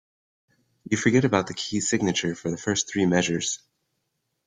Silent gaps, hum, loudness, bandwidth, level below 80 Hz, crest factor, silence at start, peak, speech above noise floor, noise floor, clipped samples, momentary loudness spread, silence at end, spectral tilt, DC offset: none; none; -24 LUFS; 9.6 kHz; -60 dBFS; 22 dB; 0.9 s; -4 dBFS; 53 dB; -77 dBFS; under 0.1%; 8 LU; 0.9 s; -4 dB/octave; under 0.1%